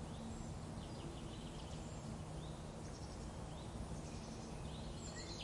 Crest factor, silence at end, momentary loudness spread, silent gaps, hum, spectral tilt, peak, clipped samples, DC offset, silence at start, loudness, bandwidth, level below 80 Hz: 14 dB; 0 s; 1 LU; none; none; -5 dB/octave; -36 dBFS; under 0.1%; under 0.1%; 0 s; -49 LUFS; 11.5 kHz; -56 dBFS